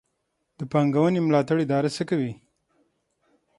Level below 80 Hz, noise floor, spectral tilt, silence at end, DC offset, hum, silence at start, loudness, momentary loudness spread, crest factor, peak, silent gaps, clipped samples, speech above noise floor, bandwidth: -66 dBFS; -76 dBFS; -7.5 dB/octave; 1.25 s; under 0.1%; none; 0.6 s; -23 LUFS; 7 LU; 18 dB; -6 dBFS; none; under 0.1%; 53 dB; 11.5 kHz